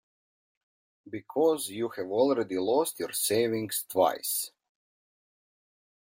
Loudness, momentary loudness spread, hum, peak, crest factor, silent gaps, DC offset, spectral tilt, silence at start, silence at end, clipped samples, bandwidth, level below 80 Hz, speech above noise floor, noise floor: -28 LUFS; 8 LU; none; -10 dBFS; 20 dB; none; under 0.1%; -3.5 dB/octave; 1.05 s; 1.6 s; under 0.1%; 16.5 kHz; -76 dBFS; over 62 dB; under -90 dBFS